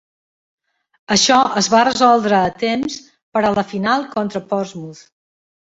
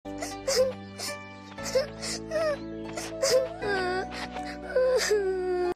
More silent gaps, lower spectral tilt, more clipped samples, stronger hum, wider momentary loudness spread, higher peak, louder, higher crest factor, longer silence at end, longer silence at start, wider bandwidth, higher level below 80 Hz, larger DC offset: first, 3.22-3.32 s vs none; about the same, -3.5 dB/octave vs -3 dB/octave; neither; neither; first, 14 LU vs 11 LU; first, 0 dBFS vs -14 dBFS; first, -16 LUFS vs -29 LUFS; about the same, 18 dB vs 16 dB; first, 0.8 s vs 0 s; first, 1.1 s vs 0.05 s; second, 8 kHz vs 15.5 kHz; about the same, -56 dBFS vs -52 dBFS; neither